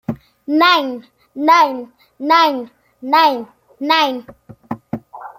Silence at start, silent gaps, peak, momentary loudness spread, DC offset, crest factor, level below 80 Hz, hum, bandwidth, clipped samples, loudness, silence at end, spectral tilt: 0.1 s; none; -2 dBFS; 19 LU; under 0.1%; 16 dB; -60 dBFS; none; 16 kHz; under 0.1%; -15 LUFS; 0.1 s; -4 dB/octave